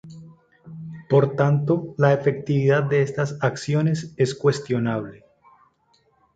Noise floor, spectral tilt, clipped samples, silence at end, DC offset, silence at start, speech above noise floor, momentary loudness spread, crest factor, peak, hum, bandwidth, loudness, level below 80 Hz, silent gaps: -63 dBFS; -7.5 dB/octave; under 0.1%; 1.2 s; under 0.1%; 0.05 s; 43 dB; 14 LU; 18 dB; -4 dBFS; none; 8.8 kHz; -22 LUFS; -60 dBFS; none